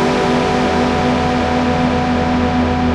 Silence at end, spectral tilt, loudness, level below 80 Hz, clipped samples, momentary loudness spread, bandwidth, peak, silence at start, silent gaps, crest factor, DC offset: 0 s; -6 dB/octave; -15 LUFS; -30 dBFS; under 0.1%; 1 LU; 10.5 kHz; -2 dBFS; 0 s; none; 12 dB; under 0.1%